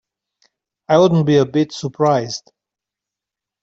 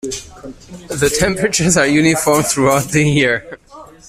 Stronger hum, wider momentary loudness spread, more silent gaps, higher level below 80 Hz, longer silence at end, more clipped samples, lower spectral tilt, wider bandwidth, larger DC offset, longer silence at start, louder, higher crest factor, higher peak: neither; second, 11 LU vs 20 LU; neither; second, -60 dBFS vs -38 dBFS; first, 1.25 s vs 0.25 s; neither; first, -6.5 dB/octave vs -4 dB/octave; second, 7.8 kHz vs 16 kHz; neither; first, 0.9 s vs 0.05 s; about the same, -16 LUFS vs -14 LUFS; about the same, 16 dB vs 14 dB; about the same, -2 dBFS vs -2 dBFS